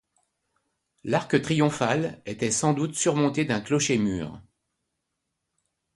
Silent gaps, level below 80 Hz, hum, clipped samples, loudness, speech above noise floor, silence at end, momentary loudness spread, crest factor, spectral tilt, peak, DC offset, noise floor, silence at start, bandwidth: none; -58 dBFS; none; under 0.1%; -25 LUFS; 56 dB; 1.55 s; 8 LU; 20 dB; -4.5 dB/octave; -8 dBFS; under 0.1%; -81 dBFS; 1.05 s; 11.5 kHz